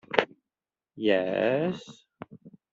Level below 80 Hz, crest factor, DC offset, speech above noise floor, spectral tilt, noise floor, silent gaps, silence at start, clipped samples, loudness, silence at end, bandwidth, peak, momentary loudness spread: -72 dBFS; 28 dB; under 0.1%; over 63 dB; -3.5 dB/octave; under -90 dBFS; none; 0.1 s; under 0.1%; -27 LUFS; 0.25 s; 7.8 kHz; -2 dBFS; 22 LU